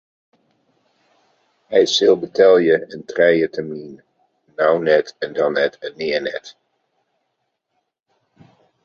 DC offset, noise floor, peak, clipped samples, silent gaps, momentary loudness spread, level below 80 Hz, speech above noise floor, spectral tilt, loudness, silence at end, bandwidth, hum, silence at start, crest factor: under 0.1%; -74 dBFS; -2 dBFS; under 0.1%; none; 16 LU; -64 dBFS; 57 dB; -4 dB/octave; -17 LUFS; 2.35 s; 7.4 kHz; none; 1.7 s; 18 dB